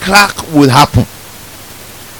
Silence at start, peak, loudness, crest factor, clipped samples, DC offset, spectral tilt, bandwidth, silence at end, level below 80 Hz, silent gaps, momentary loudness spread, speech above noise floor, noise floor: 0 s; 0 dBFS; -9 LUFS; 12 dB; 1%; 0.6%; -4.5 dB/octave; over 20 kHz; 0 s; -32 dBFS; none; 23 LU; 23 dB; -31 dBFS